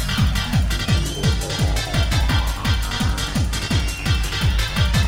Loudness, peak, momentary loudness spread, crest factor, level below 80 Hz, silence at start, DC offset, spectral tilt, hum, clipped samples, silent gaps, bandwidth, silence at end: -21 LUFS; -6 dBFS; 2 LU; 12 dB; -24 dBFS; 0 s; 0.1%; -4.5 dB/octave; none; under 0.1%; none; 16.5 kHz; 0 s